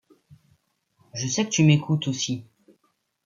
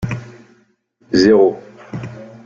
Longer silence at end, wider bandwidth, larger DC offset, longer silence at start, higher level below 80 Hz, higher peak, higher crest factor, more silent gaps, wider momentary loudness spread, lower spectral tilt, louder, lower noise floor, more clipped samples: first, 0.85 s vs 0.2 s; about the same, 7.6 kHz vs 7.4 kHz; neither; first, 0.3 s vs 0 s; second, -64 dBFS vs -48 dBFS; second, -6 dBFS vs -2 dBFS; about the same, 20 dB vs 16 dB; neither; second, 14 LU vs 21 LU; second, -4.5 dB/octave vs -6.5 dB/octave; second, -23 LUFS vs -14 LUFS; first, -71 dBFS vs -57 dBFS; neither